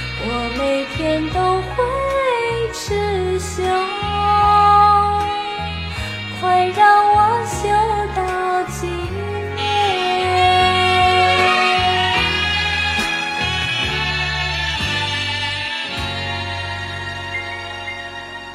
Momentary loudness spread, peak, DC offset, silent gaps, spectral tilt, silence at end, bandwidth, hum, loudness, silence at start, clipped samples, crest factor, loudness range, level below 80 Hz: 12 LU; -2 dBFS; under 0.1%; none; -4 dB/octave; 0 s; 15 kHz; none; -17 LUFS; 0 s; under 0.1%; 16 dB; 6 LU; -36 dBFS